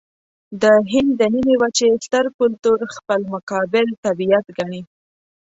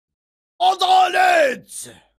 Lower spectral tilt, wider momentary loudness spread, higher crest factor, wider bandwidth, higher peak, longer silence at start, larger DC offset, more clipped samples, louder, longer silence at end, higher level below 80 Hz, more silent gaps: first, -4.5 dB/octave vs -1 dB/octave; second, 11 LU vs 17 LU; about the same, 16 dB vs 14 dB; second, 8 kHz vs 15.5 kHz; about the same, -2 dBFS vs -4 dBFS; about the same, 0.5 s vs 0.6 s; neither; neither; about the same, -18 LUFS vs -16 LUFS; first, 0.7 s vs 0.3 s; first, -56 dBFS vs -70 dBFS; first, 2.34-2.39 s, 3.43-3.47 s, 3.98-4.03 s vs none